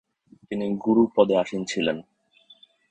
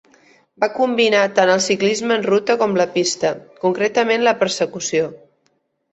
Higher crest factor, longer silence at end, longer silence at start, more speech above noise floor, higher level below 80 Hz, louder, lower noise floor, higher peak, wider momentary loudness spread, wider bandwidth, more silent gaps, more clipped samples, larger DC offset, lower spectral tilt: about the same, 20 dB vs 16 dB; first, 0.9 s vs 0.75 s; about the same, 0.5 s vs 0.6 s; second, 35 dB vs 49 dB; about the same, -64 dBFS vs -64 dBFS; second, -24 LUFS vs -18 LUFS; second, -57 dBFS vs -66 dBFS; about the same, -4 dBFS vs -2 dBFS; first, 12 LU vs 7 LU; about the same, 9 kHz vs 8.2 kHz; neither; neither; neither; first, -5.5 dB/octave vs -3.5 dB/octave